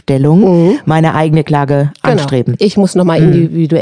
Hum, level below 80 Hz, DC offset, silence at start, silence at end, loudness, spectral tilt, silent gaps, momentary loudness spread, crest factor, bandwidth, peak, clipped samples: none; -42 dBFS; 0.3%; 0.1 s; 0 s; -10 LUFS; -8 dB/octave; none; 4 LU; 10 dB; 10 kHz; 0 dBFS; 0.5%